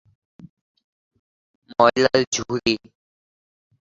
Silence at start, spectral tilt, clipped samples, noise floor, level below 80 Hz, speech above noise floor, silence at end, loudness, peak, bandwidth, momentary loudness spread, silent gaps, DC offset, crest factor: 0.45 s; -3.5 dB/octave; under 0.1%; under -90 dBFS; -58 dBFS; over 70 dB; 1.1 s; -20 LUFS; -2 dBFS; 7.8 kHz; 10 LU; 0.49-0.75 s, 0.84-1.11 s, 1.19-1.62 s, 2.27-2.32 s; under 0.1%; 22 dB